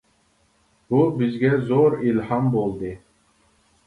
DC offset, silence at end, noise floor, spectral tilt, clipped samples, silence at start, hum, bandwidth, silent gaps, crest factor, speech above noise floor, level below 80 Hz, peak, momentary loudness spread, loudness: under 0.1%; 0.9 s; -63 dBFS; -9.5 dB/octave; under 0.1%; 0.9 s; none; 10.5 kHz; none; 16 dB; 43 dB; -54 dBFS; -6 dBFS; 12 LU; -21 LUFS